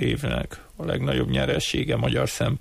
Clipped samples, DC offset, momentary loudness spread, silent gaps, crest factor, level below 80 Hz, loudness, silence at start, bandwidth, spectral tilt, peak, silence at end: under 0.1%; under 0.1%; 7 LU; none; 14 dB; -38 dBFS; -25 LUFS; 0 s; 15.5 kHz; -5.5 dB/octave; -12 dBFS; 0 s